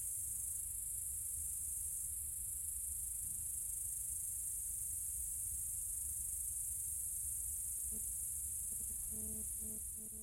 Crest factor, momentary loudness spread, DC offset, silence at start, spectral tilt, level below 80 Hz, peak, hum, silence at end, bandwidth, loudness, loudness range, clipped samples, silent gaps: 14 dB; 1 LU; under 0.1%; 0 s; -2 dB/octave; -58 dBFS; -28 dBFS; none; 0 s; 16.5 kHz; -40 LUFS; 1 LU; under 0.1%; none